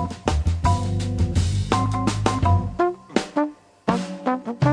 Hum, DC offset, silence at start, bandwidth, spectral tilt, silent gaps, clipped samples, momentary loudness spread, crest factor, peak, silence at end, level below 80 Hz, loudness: none; under 0.1%; 0 s; 10.5 kHz; -6.5 dB/octave; none; under 0.1%; 5 LU; 20 dB; -2 dBFS; 0 s; -32 dBFS; -23 LUFS